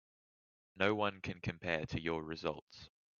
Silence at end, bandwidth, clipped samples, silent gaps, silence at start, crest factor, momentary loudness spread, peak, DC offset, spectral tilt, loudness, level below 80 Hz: 0.3 s; 7.2 kHz; under 0.1%; 2.62-2.67 s; 0.75 s; 24 dB; 14 LU; -16 dBFS; under 0.1%; -4 dB/octave; -38 LUFS; -64 dBFS